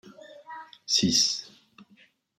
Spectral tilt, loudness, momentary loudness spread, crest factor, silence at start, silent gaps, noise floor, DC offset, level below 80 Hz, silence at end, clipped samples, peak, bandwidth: -2 dB/octave; -23 LUFS; 22 LU; 20 dB; 0.05 s; none; -61 dBFS; under 0.1%; -68 dBFS; 0.55 s; under 0.1%; -10 dBFS; 16 kHz